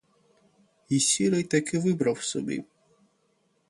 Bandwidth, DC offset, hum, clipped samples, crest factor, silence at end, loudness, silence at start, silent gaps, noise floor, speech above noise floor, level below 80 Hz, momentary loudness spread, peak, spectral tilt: 11.5 kHz; under 0.1%; none; under 0.1%; 18 dB; 1.05 s; -26 LUFS; 0.9 s; none; -70 dBFS; 44 dB; -68 dBFS; 10 LU; -10 dBFS; -4 dB/octave